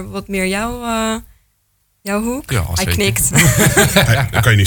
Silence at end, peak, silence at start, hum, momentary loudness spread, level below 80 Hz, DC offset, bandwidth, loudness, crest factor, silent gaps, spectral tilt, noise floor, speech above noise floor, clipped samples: 0 s; 0 dBFS; 0 s; none; 11 LU; -32 dBFS; under 0.1%; 19.5 kHz; -14 LUFS; 14 dB; none; -4 dB/octave; -62 dBFS; 48 dB; under 0.1%